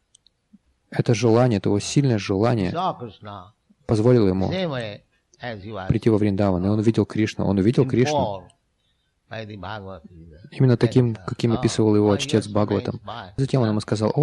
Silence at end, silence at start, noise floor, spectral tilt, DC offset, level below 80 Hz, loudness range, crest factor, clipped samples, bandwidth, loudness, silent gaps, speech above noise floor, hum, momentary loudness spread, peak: 0 s; 0.9 s; -69 dBFS; -7 dB/octave; under 0.1%; -50 dBFS; 3 LU; 16 dB; under 0.1%; 11 kHz; -21 LUFS; none; 48 dB; none; 18 LU; -6 dBFS